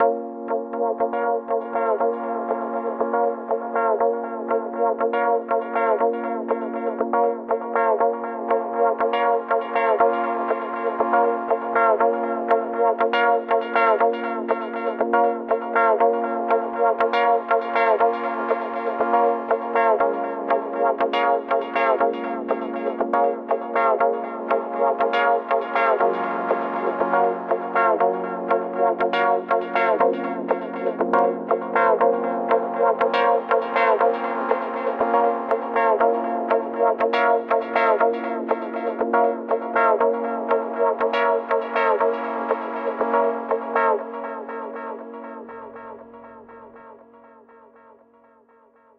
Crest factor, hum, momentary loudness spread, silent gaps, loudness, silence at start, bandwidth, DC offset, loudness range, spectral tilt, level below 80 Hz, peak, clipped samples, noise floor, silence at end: 18 dB; none; 7 LU; none; -22 LUFS; 0 s; 5.6 kHz; under 0.1%; 3 LU; -7 dB/octave; -72 dBFS; -4 dBFS; under 0.1%; -55 dBFS; 2 s